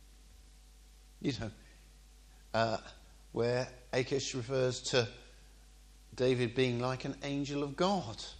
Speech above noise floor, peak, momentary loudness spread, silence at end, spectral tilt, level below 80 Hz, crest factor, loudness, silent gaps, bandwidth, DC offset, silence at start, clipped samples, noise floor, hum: 24 dB; -16 dBFS; 10 LU; 0 s; -5 dB/octave; -58 dBFS; 20 dB; -35 LUFS; none; 12.5 kHz; under 0.1%; 0 s; under 0.1%; -58 dBFS; none